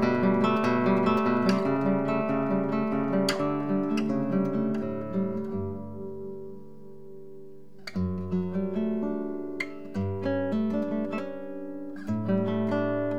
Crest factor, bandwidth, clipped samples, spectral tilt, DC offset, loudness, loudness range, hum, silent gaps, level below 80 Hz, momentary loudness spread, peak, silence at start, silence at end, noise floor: 16 dB; 14 kHz; under 0.1%; -7.5 dB/octave; 0.7%; -28 LUFS; 9 LU; none; none; -66 dBFS; 15 LU; -10 dBFS; 0 s; 0 s; -49 dBFS